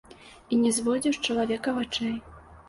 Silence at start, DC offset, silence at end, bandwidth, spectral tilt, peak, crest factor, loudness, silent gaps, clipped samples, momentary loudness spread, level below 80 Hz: 0.1 s; under 0.1%; 0.1 s; 11.5 kHz; -3.5 dB/octave; -14 dBFS; 14 dB; -27 LUFS; none; under 0.1%; 6 LU; -56 dBFS